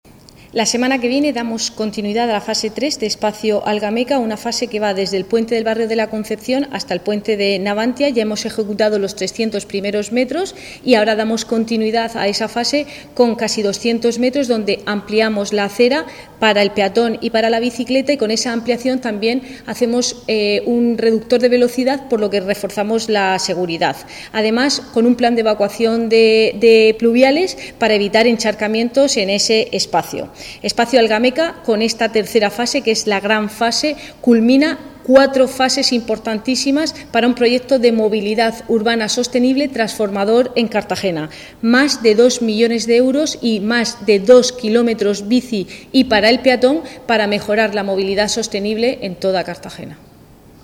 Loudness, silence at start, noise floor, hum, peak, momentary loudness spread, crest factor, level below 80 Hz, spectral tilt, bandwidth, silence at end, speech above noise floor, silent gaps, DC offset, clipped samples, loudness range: -16 LUFS; 0.55 s; -43 dBFS; none; 0 dBFS; 8 LU; 16 dB; -50 dBFS; -3.5 dB/octave; 16.5 kHz; 0.7 s; 28 dB; none; under 0.1%; under 0.1%; 5 LU